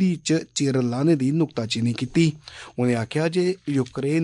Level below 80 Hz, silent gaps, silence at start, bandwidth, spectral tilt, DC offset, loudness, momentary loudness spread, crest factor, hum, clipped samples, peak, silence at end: -58 dBFS; none; 0 s; 11 kHz; -6 dB/octave; under 0.1%; -23 LUFS; 5 LU; 16 dB; none; under 0.1%; -8 dBFS; 0 s